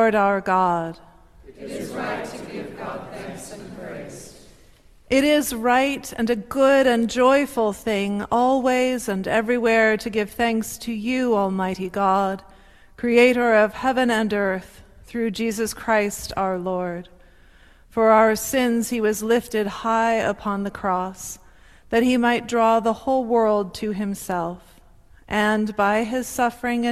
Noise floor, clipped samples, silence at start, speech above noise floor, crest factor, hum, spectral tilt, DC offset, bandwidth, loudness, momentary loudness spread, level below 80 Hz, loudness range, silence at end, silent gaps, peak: -51 dBFS; under 0.1%; 0 s; 30 dB; 18 dB; none; -4.5 dB/octave; under 0.1%; 15 kHz; -21 LUFS; 16 LU; -50 dBFS; 6 LU; 0 s; none; -4 dBFS